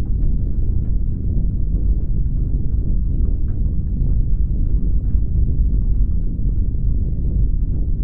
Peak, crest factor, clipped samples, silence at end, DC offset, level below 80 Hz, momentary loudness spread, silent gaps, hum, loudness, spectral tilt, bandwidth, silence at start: -4 dBFS; 12 dB; under 0.1%; 0 s; 5%; -18 dBFS; 2 LU; none; none; -22 LUFS; -14 dB/octave; 0.9 kHz; 0 s